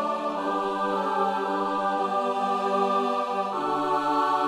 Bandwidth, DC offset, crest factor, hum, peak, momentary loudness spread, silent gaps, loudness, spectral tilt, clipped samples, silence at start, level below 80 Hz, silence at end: 14 kHz; under 0.1%; 14 dB; none; -12 dBFS; 3 LU; none; -26 LUFS; -5 dB/octave; under 0.1%; 0 s; -68 dBFS; 0 s